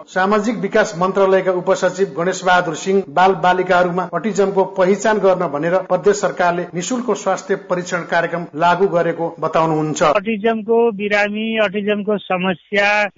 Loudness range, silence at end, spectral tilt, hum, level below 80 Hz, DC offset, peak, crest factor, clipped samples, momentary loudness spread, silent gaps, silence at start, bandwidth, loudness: 3 LU; 0.05 s; -5 dB/octave; none; -56 dBFS; under 0.1%; -4 dBFS; 12 dB; under 0.1%; 6 LU; none; 0 s; 7.8 kHz; -17 LUFS